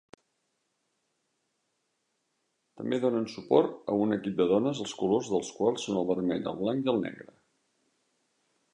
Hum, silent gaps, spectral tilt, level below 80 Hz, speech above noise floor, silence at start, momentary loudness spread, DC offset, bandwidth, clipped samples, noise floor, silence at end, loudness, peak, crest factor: none; none; -6 dB/octave; -70 dBFS; 50 dB; 2.75 s; 7 LU; under 0.1%; 10.5 kHz; under 0.1%; -78 dBFS; 1.5 s; -29 LUFS; -10 dBFS; 20 dB